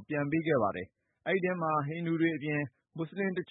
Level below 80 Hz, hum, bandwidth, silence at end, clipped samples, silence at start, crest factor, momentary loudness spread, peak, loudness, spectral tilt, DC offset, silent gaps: -72 dBFS; none; 4 kHz; 0.05 s; under 0.1%; 0 s; 16 dB; 12 LU; -16 dBFS; -32 LUFS; -11 dB/octave; under 0.1%; none